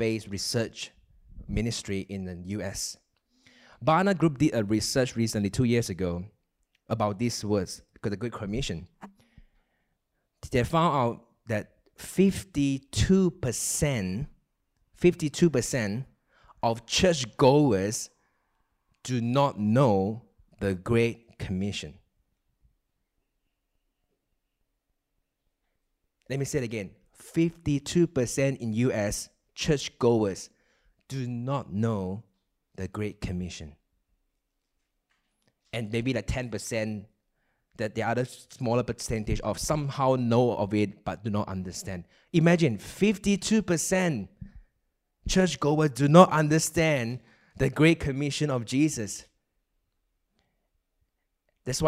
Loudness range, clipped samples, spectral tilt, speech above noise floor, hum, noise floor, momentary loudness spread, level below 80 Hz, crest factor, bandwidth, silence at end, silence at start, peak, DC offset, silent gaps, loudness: 11 LU; under 0.1%; -5.5 dB/octave; 53 dB; none; -79 dBFS; 14 LU; -48 dBFS; 26 dB; 16 kHz; 0 s; 0 s; -2 dBFS; under 0.1%; none; -27 LUFS